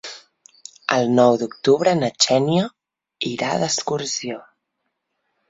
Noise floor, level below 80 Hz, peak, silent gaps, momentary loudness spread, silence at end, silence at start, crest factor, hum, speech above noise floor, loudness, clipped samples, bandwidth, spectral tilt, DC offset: -76 dBFS; -64 dBFS; -2 dBFS; none; 14 LU; 1.1 s; 0.05 s; 20 dB; none; 57 dB; -19 LUFS; under 0.1%; 8 kHz; -4 dB/octave; under 0.1%